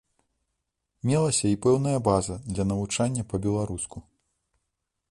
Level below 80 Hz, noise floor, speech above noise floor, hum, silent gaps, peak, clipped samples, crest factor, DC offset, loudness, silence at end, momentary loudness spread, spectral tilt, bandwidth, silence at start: -48 dBFS; -81 dBFS; 56 dB; none; none; -8 dBFS; under 0.1%; 20 dB; under 0.1%; -26 LUFS; 1.1 s; 9 LU; -5.5 dB/octave; 11.5 kHz; 1.05 s